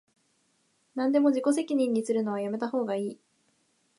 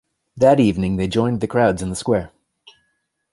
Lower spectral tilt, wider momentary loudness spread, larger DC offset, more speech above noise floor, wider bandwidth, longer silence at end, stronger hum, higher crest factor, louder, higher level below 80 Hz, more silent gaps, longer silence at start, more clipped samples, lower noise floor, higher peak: about the same, -6 dB/octave vs -6.5 dB/octave; about the same, 9 LU vs 8 LU; neither; second, 44 dB vs 53 dB; about the same, 11.5 kHz vs 11.5 kHz; second, 0.85 s vs 1.05 s; neither; about the same, 16 dB vs 18 dB; second, -28 LUFS vs -18 LUFS; second, -84 dBFS vs -42 dBFS; neither; first, 0.95 s vs 0.35 s; neither; about the same, -71 dBFS vs -70 dBFS; second, -12 dBFS vs -2 dBFS